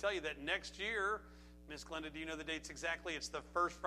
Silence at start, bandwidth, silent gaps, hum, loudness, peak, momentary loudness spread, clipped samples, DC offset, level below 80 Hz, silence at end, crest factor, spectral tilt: 0 s; 15 kHz; none; 60 Hz at -60 dBFS; -41 LUFS; -22 dBFS; 11 LU; under 0.1%; under 0.1%; -60 dBFS; 0 s; 20 dB; -3 dB/octave